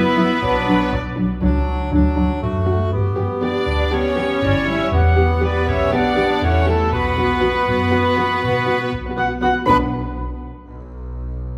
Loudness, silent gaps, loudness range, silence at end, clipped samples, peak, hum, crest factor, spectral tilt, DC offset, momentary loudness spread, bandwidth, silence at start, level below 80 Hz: -18 LUFS; none; 2 LU; 0 s; under 0.1%; -2 dBFS; none; 14 dB; -7.5 dB/octave; under 0.1%; 10 LU; 9.4 kHz; 0 s; -26 dBFS